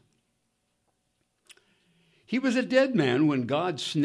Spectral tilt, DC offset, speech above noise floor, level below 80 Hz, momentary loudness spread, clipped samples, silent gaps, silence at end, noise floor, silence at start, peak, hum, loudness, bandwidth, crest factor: -6 dB/octave; under 0.1%; 51 dB; -76 dBFS; 6 LU; under 0.1%; none; 0 s; -75 dBFS; 2.3 s; -10 dBFS; none; -25 LUFS; 11 kHz; 20 dB